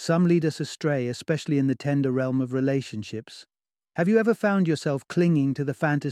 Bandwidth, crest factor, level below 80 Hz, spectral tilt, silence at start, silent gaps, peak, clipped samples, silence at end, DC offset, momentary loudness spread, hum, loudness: 12.5 kHz; 16 dB; -68 dBFS; -7 dB/octave; 0 s; none; -8 dBFS; under 0.1%; 0 s; under 0.1%; 11 LU; none; -24 LUFS